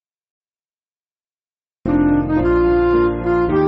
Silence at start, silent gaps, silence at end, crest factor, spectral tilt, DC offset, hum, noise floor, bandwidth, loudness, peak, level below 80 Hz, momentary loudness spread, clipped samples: 1.85 s; none; 0 s; 14 dB; -8 dB/octave; under 0.1%; none; under -90 dBFS; 5.2 kHz; -16 LUFS; -4 dBFS; -32 dBFS; 4 LU; under 0.1%